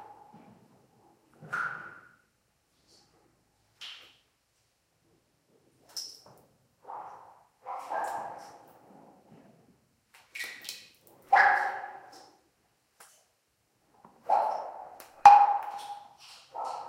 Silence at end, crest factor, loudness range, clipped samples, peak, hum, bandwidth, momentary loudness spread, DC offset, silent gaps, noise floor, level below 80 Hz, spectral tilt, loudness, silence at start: 0 s; 28 dB; 22 LU; under 0.1%; -4 dBFS; none; 16 kHz; 27 LU; under 0.1%; none; -74 dBFS; -76 dBFS; -1.5 dB/octave; -26 LUFS; 0 s